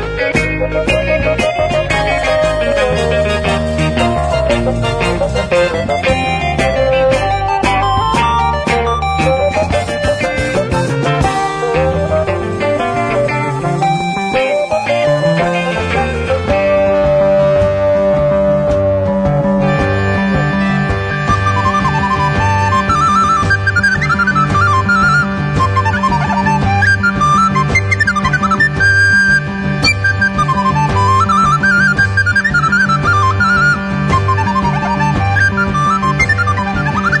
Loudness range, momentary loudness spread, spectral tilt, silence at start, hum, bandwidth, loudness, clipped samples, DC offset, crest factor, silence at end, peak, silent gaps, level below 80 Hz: 4 LU; 5 LU; -5.5 dB/octave; 0 s; none; 10.5 kHz; -12 LUFS; under 0.1%; under 0.1%; 12 dB; 0 s; 0 dBFS; none; -28 dBFS